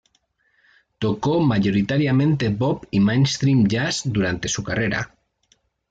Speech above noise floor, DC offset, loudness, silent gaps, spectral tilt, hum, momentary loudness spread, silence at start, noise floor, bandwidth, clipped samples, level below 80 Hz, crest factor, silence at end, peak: 46 dB; under 0.1%; -20 LUFS; none; -5.5 dB/octave; none; 6 LU; 1 s; -66 dBFS; 9.2 kHz; under 0.1%; -50 dBFS; 14 dB; 0.85 s; -8 dBFS